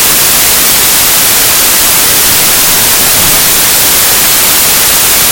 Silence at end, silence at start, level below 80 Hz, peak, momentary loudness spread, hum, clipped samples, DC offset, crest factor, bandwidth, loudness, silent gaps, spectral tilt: 0 s; 0 s; -30 dBFS; 0 dBFS; 0 LU; none; 5%; under 0.1%; 6 dB; over 20 kHz; -3 LUFS; none; 0 dB/octave